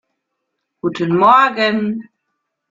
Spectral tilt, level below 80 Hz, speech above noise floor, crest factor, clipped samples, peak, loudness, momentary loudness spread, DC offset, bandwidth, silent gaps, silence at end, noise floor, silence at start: -6.5 dB/octave; -60 dBFS; 61 dB; 16 dB; under 0.1%; 0 dBFS; -14 LUFS; 14 LU; under 0.1%; 7.6 kHz; none; 0.7 s; -75 dBFS; 0.85 s